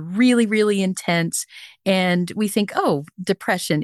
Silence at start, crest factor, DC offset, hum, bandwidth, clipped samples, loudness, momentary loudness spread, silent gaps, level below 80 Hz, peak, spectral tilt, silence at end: 0 s; 14 dB; under 0.1%; none; 12.5 kHz; under 0.1%; -20 LUFS; 8 LU; none; -68 dBFS; -6 dBFS; -5 dB/octave; 0 s